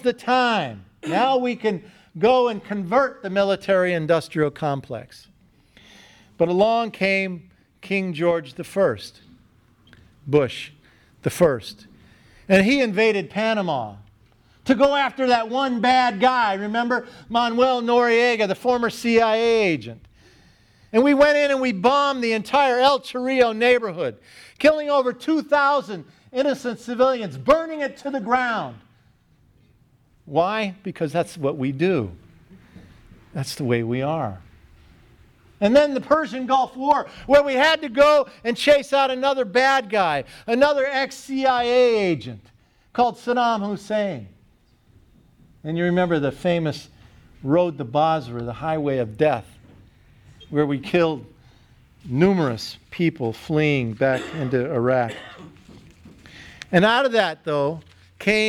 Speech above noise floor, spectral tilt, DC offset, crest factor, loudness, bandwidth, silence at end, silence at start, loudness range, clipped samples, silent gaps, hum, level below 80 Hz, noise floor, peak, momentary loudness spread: 38 dB; -5.5 dB/octave; under 0.1%; 20 dB; -21 LUFS; 15 kHz; 0 s; 0.05 s; 7 LU; under 0.1%; none; none; -56 dBFS; -58 dBFS; -2 dBFS; 12 LU